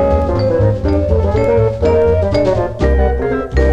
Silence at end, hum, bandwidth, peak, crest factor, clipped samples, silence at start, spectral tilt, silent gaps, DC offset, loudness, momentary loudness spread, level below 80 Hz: 0 s; none; 7.8 kHz; -2 dBFS; 12 dB; under 0.1%; 0 s; -8.5 dB/octave; none; under 0.1%; -14 LUFS; 3 LU; -20 dBFS